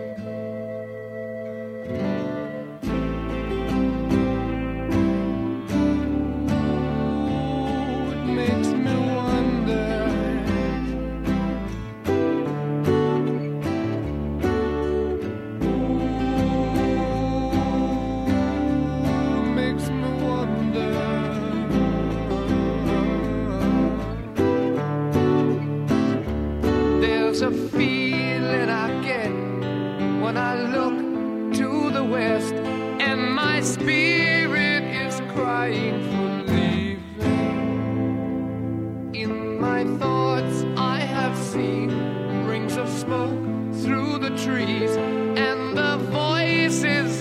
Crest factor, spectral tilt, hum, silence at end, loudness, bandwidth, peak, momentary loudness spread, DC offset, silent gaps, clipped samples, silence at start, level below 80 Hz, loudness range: 18 dB; -6 dB/octave; none; 0 s; -23 LUFS; 14 kHz; -6 dBFS; 6 LU; under 0.1%; none; under 0.1%; 0 s; -38 dBFS; 3 LU